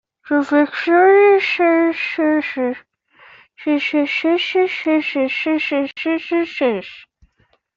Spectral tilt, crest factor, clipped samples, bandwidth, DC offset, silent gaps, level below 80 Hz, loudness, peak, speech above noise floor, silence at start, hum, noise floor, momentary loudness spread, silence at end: -5 dB/octave; 14 dB; under 0.1%; 7.4 kHz; under 0.1%; none; -64 dBFS; -17 LUFS; -4 dBFS; 45 dB; 0.25 s; none; -61 dBFS; 10 LU; 0.75 s